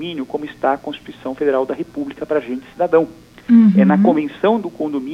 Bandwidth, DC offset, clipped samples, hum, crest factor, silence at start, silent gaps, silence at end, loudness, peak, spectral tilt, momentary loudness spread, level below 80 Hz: 6.2 kHz; under 0.1%; under 0.1%; none; 14 dB; 0 s; none; 0 s; -17 LUFS; -2 dBFS; -8.5 dB/octave; 16 LU; -56 dBFS